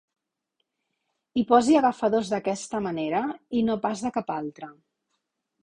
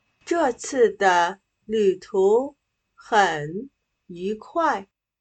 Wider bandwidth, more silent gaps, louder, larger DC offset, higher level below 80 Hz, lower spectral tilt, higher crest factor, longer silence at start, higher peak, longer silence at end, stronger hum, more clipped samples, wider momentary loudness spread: first, 10.5 kHz vs 9 kHz; neither; second, -25 LUFS vs -22 LUFS; neither; about the same, -64 dBFS vs -64 dBFS; first, -5.5 dB/octave vs -4 dB/octave; about the same, 22 dB vs 20 dB; first, 1.35 s vs 0.25 s; about the same, -4 dBFS vs -4 dBFS; first, 0.9 s vs 0.4 s; neither; neither; about the same, 12 LU vs 14 LU